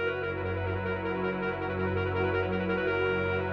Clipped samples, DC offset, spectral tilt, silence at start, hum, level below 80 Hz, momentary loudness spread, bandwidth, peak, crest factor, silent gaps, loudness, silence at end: under 0.1%; under 0.1%; -8.5 dB/octave; 0 s; none; -52 dBFS; 4 LU; 6 kHz; -16 dBFS; 14 dB; none; -30 LUFS; 0 s